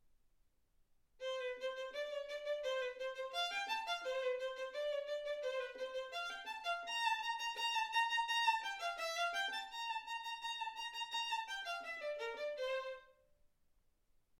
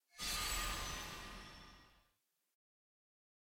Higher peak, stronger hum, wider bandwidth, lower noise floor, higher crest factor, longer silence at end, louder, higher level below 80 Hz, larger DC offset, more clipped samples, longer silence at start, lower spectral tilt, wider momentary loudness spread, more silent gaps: first, -22 dBFS vs -28 dBFS; neither; about the same, 16.5 kHz vs 17 kHz; second, -75 dBFS vs -83 dBFS; about the same, 20 dB vs 20 dB; second, 1.25 s vs 1.6 s; about the same, -41 LUFS vs -42 LUFS; second, -76 dBFS vs -56 dBFS; neither; neither; first, 1.2 s vs 0.15 s; second, 1.5 dB/octave vs -1 dB/octave; second, 8 LU vs 18 LU; neither